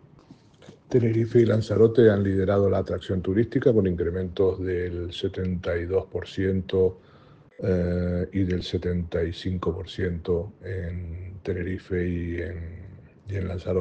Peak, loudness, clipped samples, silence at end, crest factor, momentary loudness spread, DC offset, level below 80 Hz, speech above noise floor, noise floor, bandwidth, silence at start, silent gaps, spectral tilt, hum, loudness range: -6 dBFS; -25 LUFS; under 0.1%; 0 s; 20 dB; 12 LU; under 0.1%; -50 dBFS; 28 dB; -52 dBFS; 8.2 kHz; 0.3 s; none; -8.5 dB/octave; none; 9 LU